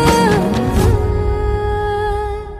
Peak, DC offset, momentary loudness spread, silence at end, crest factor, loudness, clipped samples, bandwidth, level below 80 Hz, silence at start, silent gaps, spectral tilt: 0 dBFS; under 0.1%; 6 LU; 0 s; 14 dB; -16 LUFS; under 0.1%; 15.5 kHz; -22 dBFS; 0 s; none; -6 dB/octave